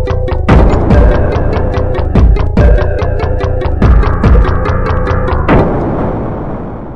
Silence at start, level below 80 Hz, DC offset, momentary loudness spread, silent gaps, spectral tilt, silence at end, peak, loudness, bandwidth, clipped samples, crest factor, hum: 0 s; -12 dBFS; 2%; 7 LU; none; -9 dB/octave; 0 s; 0 dBFS; -11 LUFS; 6.2 kHz; under 0.1%; 8 dB; none